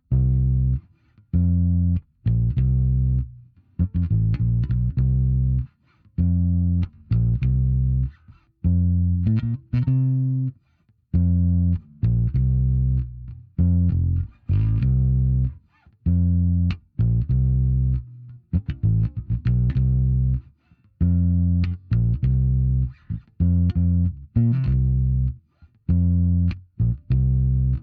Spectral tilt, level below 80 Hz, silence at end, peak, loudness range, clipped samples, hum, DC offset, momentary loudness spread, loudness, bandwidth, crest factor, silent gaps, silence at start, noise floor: -11.5 dB/octave; -28 dBFS; 0 s; -8 dBFS; 1 LU; under 0.1%; none; under 0.1%; 7 LU; -22 LUFS; 4.4 kHz; 12 dB; none; 0.1 s; -63 dBFS